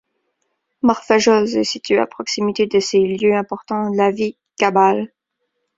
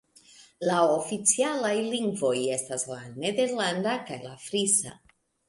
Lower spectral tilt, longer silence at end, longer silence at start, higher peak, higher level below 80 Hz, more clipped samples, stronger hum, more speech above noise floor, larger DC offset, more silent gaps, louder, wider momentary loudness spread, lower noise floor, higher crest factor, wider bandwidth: first, -4.5 dB/octave vs -3 dB/octave; first, 0.7 s vs 0.55 s; first, 0.85 s vs 0.4 s; first, -2 dBFS vs -8 dBFS; first, -60 dBFS vs -70 dBFS; neither; neither; first, 57 dB vs 28 dB; neither; neither; first, -17 LUFS vs -26 LUFS; about the same, 9 LU vs 9 LU; first, -73 dBFS vs -55 dBFS; about the same, 16 dB vs 20 dB; second, 7.8 kHz vs 11.5 kHz